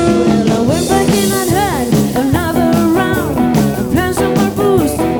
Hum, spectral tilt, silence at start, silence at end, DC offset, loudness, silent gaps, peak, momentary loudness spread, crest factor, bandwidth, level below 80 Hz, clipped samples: none; -5.5 dB/octave; 0 s; 0 s; under 0.1%; -13 LUFS; none; 0 dBFS; 2 LU; 12 dB; over 20 kHz; -32 dBFS; under 0.1%